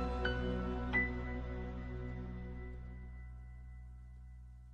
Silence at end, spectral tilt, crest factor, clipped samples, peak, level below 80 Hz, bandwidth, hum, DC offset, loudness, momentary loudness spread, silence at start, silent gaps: 0 s; -7.5 dB/octave; 18 dB; under 0.1%; -24 dBFS; -44 dBFS; 6.6 kHz; none; under 0.1%; -40 LUFS; 20 LU; 0 s; none